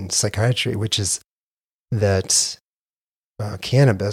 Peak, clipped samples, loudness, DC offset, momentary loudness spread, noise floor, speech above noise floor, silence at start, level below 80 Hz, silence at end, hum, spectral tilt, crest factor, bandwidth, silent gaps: -4 dBFS; under 0.1%; -20 LUFS; under 0.1%; 12 LU; under -90 dBFS; over 71 dB; 0 s; -52 dBFS; 0 s; none; -4 dB/octave; 18 dB; 15.5 kHz; 1.37-1.57 s, 1.64-1.86 s, 2.61-3.34 s